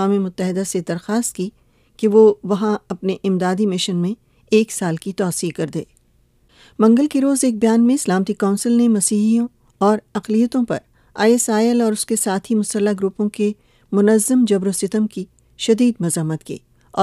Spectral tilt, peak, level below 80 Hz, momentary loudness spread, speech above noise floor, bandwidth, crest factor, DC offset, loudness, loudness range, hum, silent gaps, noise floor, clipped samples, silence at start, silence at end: -5 dB/octave; -2 dBFS; -58 dBFS; 11 LU; 40 dB; 15.5 kHz; 16 dB; under 0.1%; -18 LUFS; 4 LU; none; none; -57 dBFS; under 0.1%; 0 s; 0 s